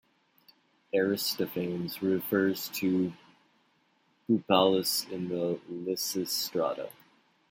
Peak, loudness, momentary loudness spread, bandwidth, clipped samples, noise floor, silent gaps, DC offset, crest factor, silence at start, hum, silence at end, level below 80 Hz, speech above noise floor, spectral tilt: -10 dBFS; -30 LUFS; 10 LU; 16.5 kHz; under 0.1%; -70 dBFS; none; under 0.1%; 22 dB; 0.95 s; none; 0.6 s; -76 dBFS; 41 dB; -4 dB/octave